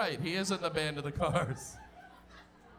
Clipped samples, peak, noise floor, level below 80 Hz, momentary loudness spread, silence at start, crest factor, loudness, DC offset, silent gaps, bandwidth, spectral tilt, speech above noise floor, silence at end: under 0.1%; -18 dBFS; -56 dBFS; -56 dBFS; 22 LU; 0 s; 18 dB; -34 LUFS; under 0.1%; none; 15.5 kHz; -4.5 dB/octave; 22 dB; 0 s